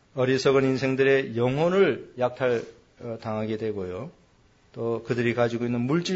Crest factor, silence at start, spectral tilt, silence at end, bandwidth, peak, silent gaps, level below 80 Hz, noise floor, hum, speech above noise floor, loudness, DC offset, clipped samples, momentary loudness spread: 16 dB; 0.15 s; -6.5 dB/octave; 0 s; 8 kHz; -10 dBFS; none; -60 dBFS; -60 dBFS; none; 35 dB; -25 LUFS; under 0.1%; under 0.1%; 14 LU